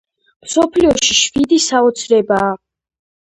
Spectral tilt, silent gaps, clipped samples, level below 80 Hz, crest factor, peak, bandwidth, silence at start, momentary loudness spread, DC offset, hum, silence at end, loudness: -2.5 dB/octave; none; under 0.1%; -44 dBFS; 16 dB; 0 dBFS; 11 kHz; 0.45 s; 7 LU; under 0.1%; none; 0.65 s; -13 LUFS